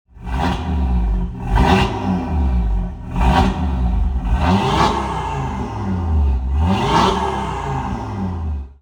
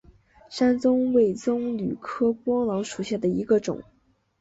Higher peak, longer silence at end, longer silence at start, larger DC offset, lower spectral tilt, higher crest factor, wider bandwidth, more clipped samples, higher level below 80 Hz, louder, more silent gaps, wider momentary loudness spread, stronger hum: first, -2 dBFS vs -10 dBFS; second, 0.1 s vs 0.6 s; second, 0.15 s vs 0.5 s; neither; about the same, -6.5 dB/octave vs -6.5 dB/octave; about the same, 16 dB vs 16 dB; first, 10.5 kHz vs 8 kHz; neither; first, -22 dBFS vs -58 dBFS; first, -19 LUFS vs -24 LUFS; neither; about the same, 9 LU vs 9 LU; neither